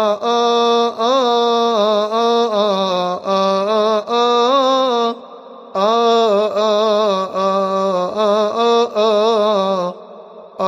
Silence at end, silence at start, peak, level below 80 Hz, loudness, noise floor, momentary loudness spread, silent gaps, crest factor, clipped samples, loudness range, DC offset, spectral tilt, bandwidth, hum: 0 s; 0 s; -2 dBFS; -72 dBFS; -15 LUFS; -37 dBFS; 5 LU; none; 14 dB; under 0.1%; 1 LU; under 0.1%; -4.5 dB/octave; 10.5 kHz; none